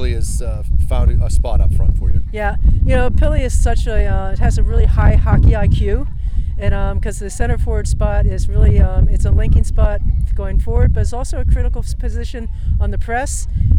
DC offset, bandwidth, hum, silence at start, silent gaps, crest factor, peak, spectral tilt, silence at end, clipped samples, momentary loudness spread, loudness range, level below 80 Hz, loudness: under 0.1%; 11.5 kHz; none; 0 s; none; 10 dB; -4 dBFS; -7 dB/octave; 0 s; under 0.1%; 9 LU; 4 LU; -14 dBFS; -17 LUFS